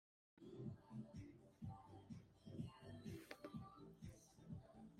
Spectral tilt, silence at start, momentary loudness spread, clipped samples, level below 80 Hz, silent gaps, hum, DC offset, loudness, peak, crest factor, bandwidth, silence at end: -7 dB/octave; 0.35 s; 6 LU; under 0.1%; -74 dBFS; none; none; under 0.1%; -58 LUFS; -34 dBFS; 22 dB; 15.5 kHz; 0 s